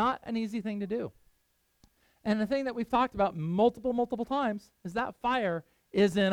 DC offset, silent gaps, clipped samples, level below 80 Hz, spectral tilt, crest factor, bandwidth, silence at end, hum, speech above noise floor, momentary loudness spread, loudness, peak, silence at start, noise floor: under 0.1%; none; under 0.1%; -60 dBFS; -6.5 dB/octave; 16 dB; 13.5 kHz; 0 s; none; 43 dB; 9 LU; -31 LUFS; -14 dBFS; 0 s; -73 dBFS